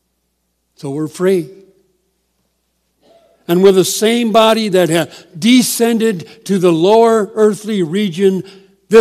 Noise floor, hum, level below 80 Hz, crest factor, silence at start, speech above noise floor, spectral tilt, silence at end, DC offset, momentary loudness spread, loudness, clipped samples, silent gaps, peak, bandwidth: -66 dBFS; none; -62 dBFS; 14 dB; 0.85 s; 54 dB; -4.5 dB/octave; 0 s; under 0.1%; 13 LU; -13 LUFS; 0.4%; none; 0 dBFS; 15 kHz